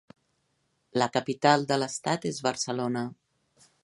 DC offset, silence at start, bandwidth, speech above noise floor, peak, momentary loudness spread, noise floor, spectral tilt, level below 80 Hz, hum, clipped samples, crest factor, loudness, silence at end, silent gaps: under 0.1%; 0.95 s; 11.5 kHz; 47 dB; -6 dBFS; 9 LU; -74 dBFS; -4 dB/octave; -72 dBFS; none; under 0.1%; 24 dB; -28 LUFS; 0.7 s; none